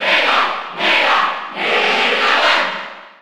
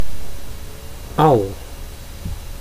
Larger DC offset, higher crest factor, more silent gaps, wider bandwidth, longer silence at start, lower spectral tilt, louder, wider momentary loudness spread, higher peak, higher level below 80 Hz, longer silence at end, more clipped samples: first, 0.7% vs under 0.1%; about the same, 14 dB vs 18 dB; neither; first, 18.5 kHz vs 15.5 kHz; about the same, 0 s vs 0 s; second, -1.5 dB/octave vs -6.5 dB/octave; first, -14 LUFS vs -19 LUFS; second, 8 LU vs 21 LU; about the same, -2 dBFS vs 0 dBFS; second, -68 dBFS vs -32 dBFS; about the same, 0.05 s vs 0 s; neither